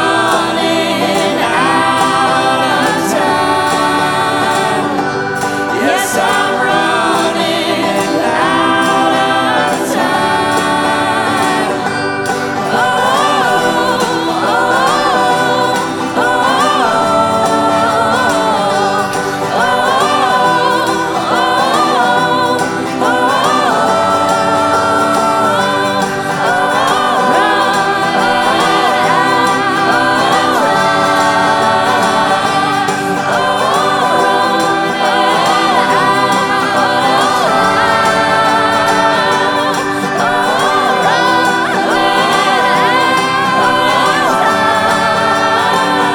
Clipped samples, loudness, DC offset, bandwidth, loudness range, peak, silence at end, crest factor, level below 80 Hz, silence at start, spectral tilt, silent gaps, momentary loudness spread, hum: under 0.1%; -11 LUFS; under 0.1%; 18.5 kHz; 2 LU; 0 dBFS; 0 s; 12 dB; -50 dBFS; 0 s; -3.5 dB/octave; none; 3 LU; none